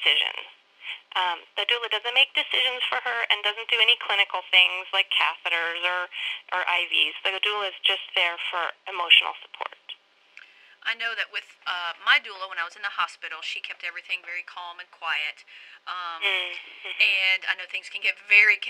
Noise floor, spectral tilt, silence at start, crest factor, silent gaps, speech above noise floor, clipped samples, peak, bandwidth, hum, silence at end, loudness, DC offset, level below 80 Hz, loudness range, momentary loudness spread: -53 dBFS; 1.5 dB/octave; 0 s; 24 dB; none; 27 dB; under 0.1%; -2 dBFS; 16.5 kHz; none; 0 s; -23 LUFS; under 0.1%; -82 dBFS; 9 LU; 17 LU